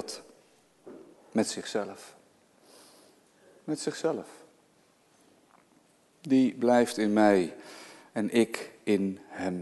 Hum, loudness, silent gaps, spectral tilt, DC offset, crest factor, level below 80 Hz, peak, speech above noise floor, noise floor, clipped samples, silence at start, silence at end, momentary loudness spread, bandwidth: none; -28 LUFS; none; -5 dB/octave; under 0.1%; 22 dB; -72 dBFS; -10 dBFS; 37 dB; -65 dBFS; under 0.1%; 0 s; 0 s; 23 LU; 12.5 kHz